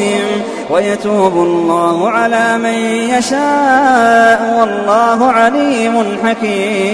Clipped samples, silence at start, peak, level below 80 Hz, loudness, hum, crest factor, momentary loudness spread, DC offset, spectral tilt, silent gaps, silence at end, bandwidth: under 0.1%; 0 s; 0 dBFS; -52 dBFS; -11 LUFS; none; 12 dB; 6 LU; under 0.1%; -4.5 dB/octave; none; 0 s; 11 kHz